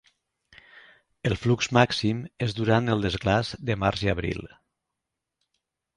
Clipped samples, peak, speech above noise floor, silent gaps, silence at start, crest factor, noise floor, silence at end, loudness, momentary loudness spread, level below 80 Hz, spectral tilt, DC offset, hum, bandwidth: under 0.1%; -4 dBFS; 60 dB; none; 1.25 s; 24 dB; -85 dBFS; 1.5 s; -25 LUFS; 9 LU; -46 dBFS; -6 dB/octave; under 0.1%; none; 11 kHz